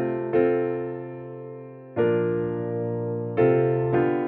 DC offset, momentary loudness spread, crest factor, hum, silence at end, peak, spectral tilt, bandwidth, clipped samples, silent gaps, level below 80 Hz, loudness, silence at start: under 0.1%; 16 LU; 16 dB; none; 0 s; -8 dBFS; -8.5 dB/octave; 4 kHz; under 0.1%; none; -60 dBFS; -24 LUFS; 0 s